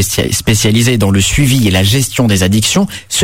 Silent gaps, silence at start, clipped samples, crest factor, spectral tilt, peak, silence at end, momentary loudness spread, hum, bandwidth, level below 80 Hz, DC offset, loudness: none; 0 s; under 0.1%; 10 dB; -4 dB/octave; 0 dBFS; 0 s; 3 LU; none; 16.5 kHz; -28 dBFS; under 0.1%; -11 LUFS